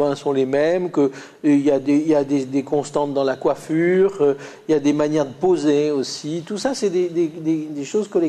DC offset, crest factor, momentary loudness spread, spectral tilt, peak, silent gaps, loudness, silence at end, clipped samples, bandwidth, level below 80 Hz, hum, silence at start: under 0.1%; 14 dB; 7 LU; -6 dB/octave; -6 dBFS; none; -20 LUFS; 0 s; under 0.1%; 10.5 kHz; -60 dBFS; none; 0 s